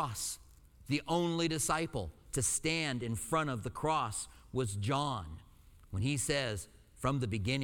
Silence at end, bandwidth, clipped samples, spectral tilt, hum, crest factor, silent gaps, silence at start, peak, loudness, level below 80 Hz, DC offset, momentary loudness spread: 0 s; 19 kHz; under 0.1%; -4 dB/octave; none; 18 dB; none; 0 s; -18 dBFS; -35 LUFS; -54 dBFS; under 0.1%; 10 LU